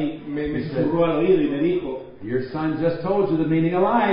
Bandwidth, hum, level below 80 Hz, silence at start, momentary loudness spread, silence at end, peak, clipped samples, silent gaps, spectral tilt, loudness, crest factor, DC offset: 5.4 kHz; none; -50 dBFS; 0 s; 9 LU; 0 s; -6 dBFS; under 0.1%; none; -12 dB/octave; -22 LUFS; 14 dB; under 0.1%